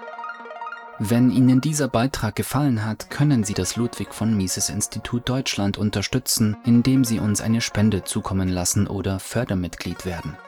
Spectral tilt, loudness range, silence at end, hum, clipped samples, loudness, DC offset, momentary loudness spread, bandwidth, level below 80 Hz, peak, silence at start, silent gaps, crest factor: -5 dB/octave; 2 LU; 0 s; none; under 0.1%; -22 LUFS; under 0.1%; 12 LU; 19.5 kHz; -46 dBFS; -6 dBFS; 0 s; none; 14 dB